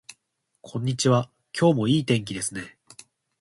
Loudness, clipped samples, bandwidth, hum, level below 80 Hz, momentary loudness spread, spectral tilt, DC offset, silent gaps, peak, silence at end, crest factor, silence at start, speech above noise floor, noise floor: -24 LUFS; under 0.1%; 11.5 kHz; none; -60 dBFS; 14 LU; -5.5 dB/octave; under 0.1%; none; -8 dBFS; 0.7 s; 18 dB; 0.65 s; 52 dB; -75 dBFS